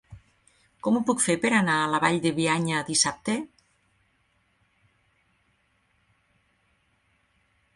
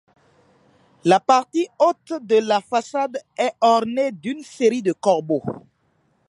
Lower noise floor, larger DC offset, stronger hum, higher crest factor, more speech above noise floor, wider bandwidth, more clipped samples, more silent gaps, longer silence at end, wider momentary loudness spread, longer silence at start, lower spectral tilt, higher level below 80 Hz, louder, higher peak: first, -69 dBFS vs -65 dBFS; neither; neither; about the same, 22 dB vs 20 dB; about the same, 45 dB vs 45 dB; about the same, 11.5 kHz vs 11.5 kHz; neither; neither; first, 4.3 s vs 0.7 s; about the same, 9 LU vs 10 LU; second, 0.1 s vs 1.05 s; second, -3.5 dB/octave vs -5 dB/octave; about the same, -64 dBFS vs -68 dBFS; second, -24 LUFS vs -20 LUFS; second, -6 dBFS vs -2 dBFS